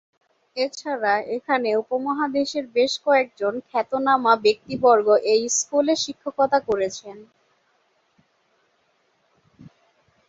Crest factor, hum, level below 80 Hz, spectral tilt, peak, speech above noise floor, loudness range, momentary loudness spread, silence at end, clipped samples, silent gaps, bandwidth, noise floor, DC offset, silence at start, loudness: 20 dB; none; -66 dBFS; -2.5 dB/octave; -4 dBFS; 45 dB; 8 LU; 9 LU; 0.6 s; under 0.1%; none; 8 kHz; -66 dBFS; under 0.1%; 0.55 s; -21 LUFS